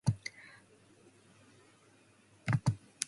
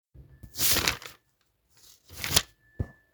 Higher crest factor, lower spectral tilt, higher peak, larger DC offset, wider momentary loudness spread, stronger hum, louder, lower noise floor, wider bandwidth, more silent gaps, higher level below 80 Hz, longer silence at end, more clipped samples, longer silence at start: about the same, 30 dB vs 28 dB; first, -5 dB/octave vs -1.5 dB/octave; second, -10 dBFS vs -4 dBFS; neither; about the same, 23 LU vs 24 LU; neither; second, -36 LUFS vs -25 LUFS; second, -65 dBFS vs -72 dBFS; second, 11.5 kHz vs over 20 kHz; neither; second, -60 dBFS vs -50 dBFS; second, 0.05 s vs 0.2 s; neither; about the same, 0.05 s vs 0.15 s